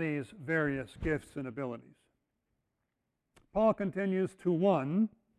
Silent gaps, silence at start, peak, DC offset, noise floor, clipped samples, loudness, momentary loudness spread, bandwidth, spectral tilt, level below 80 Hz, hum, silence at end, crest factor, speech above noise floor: none; 0 s; -16 dBFS; under 0.1%; -84 dBFS; under 0.1%; -33 LUFS; 11 LU; 11 kHz; -8 dB/octave; -56 dBFS; none; 0.3 s; 18 dB; 52 dB